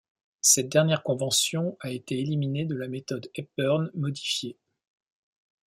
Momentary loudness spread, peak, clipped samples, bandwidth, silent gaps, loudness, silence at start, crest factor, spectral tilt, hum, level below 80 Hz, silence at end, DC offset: 14 LU; -6 dBFS; under 0.1%; 16.5 kHz; none; -26 LUFS; 0.45 s; 22 dB; -3.5 dB/octave; none; -70 dBFS; 1.2 s; under 0.1%